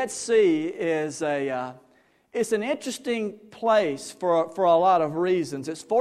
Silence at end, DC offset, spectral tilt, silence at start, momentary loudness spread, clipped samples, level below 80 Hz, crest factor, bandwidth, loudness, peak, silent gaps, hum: 0 s; under 0.1%; -4.5 dB/octave; 0 s; 11 LU; under 0.1%; -72 dBFS; 16 dB; 14 kHz; -24 LUFS; -8 dBFS; none; none